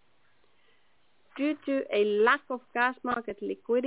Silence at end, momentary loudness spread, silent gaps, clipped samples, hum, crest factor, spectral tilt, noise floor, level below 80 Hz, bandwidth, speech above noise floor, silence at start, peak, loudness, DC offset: 0 s; 11 LU; none; under 0.1%; none; 20 dB; -8 dB/octave; -70 dBFS; -72 dBFS; 4 kHz; 42 dB; 1.35 s; -10 dBFS; -29 LUFS; under 0.1%